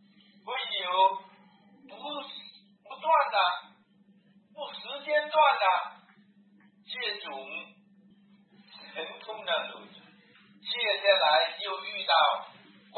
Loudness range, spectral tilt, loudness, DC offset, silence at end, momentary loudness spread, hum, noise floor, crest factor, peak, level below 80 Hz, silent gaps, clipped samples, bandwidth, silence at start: 11 LU; -5 dB/octave; -28 LUFS; under 0.1%; 0 s; 20 LU; none; -62 dBFS; 22 dB; -8 dBFS; under -90 dBFS; none; under 0.1%; 4.5 kHz; 0.45 s